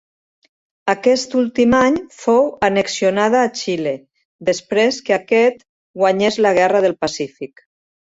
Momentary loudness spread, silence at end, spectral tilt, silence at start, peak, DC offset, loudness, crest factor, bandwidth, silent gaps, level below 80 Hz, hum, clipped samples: 11 LU; 0.65 s; -4.5 dB/octave; 0.85 s; -2 dBFS; under 0.1%; -17 LUFS; 16 dB; 8 kHz; 4.25-4.39 s, 5.69-5.94 s; -52 dBFS; none; under 0.1%